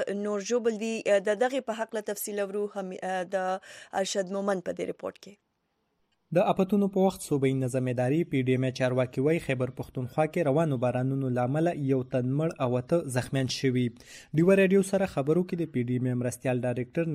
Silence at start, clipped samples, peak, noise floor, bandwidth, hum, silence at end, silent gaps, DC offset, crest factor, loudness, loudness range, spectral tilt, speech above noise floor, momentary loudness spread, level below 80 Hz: 0 s; under 0.1%; -12 dBFS; -76 dBFS; 15 kHz; none; 0 s; none; under 0.1%; 16 dB; -28 LUFS; 5 LU; -6.5 dB/octave; 49 dB; 8 LU; -62 dBFS